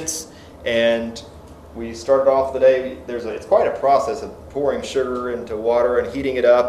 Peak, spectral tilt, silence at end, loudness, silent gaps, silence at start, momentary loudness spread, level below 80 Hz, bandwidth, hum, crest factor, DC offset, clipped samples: -2 dBFS; -4 dB/octave; 0 s; -20 LUFS; none; 0 s; 14 LU; -46 dBFS; 14 kHz; none; 16 dB; under 0.1%; under 0.1%